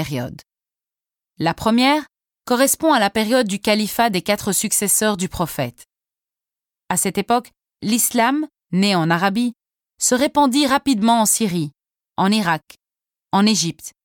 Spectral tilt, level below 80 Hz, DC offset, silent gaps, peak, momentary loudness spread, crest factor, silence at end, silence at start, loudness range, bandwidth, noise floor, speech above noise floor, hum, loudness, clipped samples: -3.5 dB/octave; -52 dBFS; under 0.1%; none; -6 dBFS; 9 LU; 14 dB; 0.15 s; 0 s; 4 LU; 19 kHz; -90 dBFS; 72 dB; none; -18 LUFS; under 0.1%